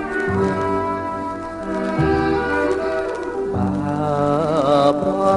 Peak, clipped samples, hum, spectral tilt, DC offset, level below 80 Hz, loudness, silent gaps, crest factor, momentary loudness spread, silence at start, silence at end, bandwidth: -4 dBFS; under 0.1%; none; -7 dB/octave; under 0.1%; -40 dBFS; -20 LUFS; none; 16 dB; 8 LU; 0 s; 0 s; 11 kHz